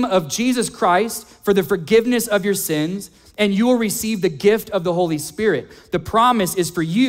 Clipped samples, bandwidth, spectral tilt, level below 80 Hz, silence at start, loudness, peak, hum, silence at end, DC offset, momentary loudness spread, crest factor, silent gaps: under 0.1%; 16.5 kHz; -4.5 dB/octave; -50 dBFS; 0 s; -19 LUFS; -2 dBFS; none; 0 s; under 0.1%; 9 LU; 16 dB; none